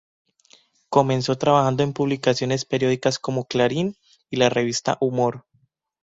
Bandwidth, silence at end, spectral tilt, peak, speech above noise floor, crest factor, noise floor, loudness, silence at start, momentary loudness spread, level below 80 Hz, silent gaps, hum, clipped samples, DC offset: 7.8 kHz; 0.75 s; -5.5 dB/octave; -2 dBFS; 45 dB; 20 dB; -66 dBFS; -22 LUFS; 0.9 s; 7 LU; -60 dBFS; none; none; under 0.1%; under 0.1%